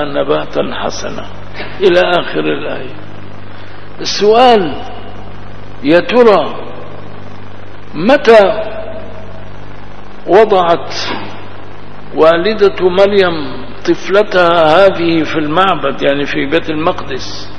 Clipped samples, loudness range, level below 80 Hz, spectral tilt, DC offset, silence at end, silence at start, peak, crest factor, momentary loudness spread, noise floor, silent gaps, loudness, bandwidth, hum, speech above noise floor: 0.9%; 5 LU; -40 dBFS; -5 dB/octave; 10%; 0 s; 0 s; 0 dBFS; 14 dB; 24 LU; -32 dBFS; none; -11 LUFS; 11 kHz; 50 Hz at -35 dBFS; 21 dB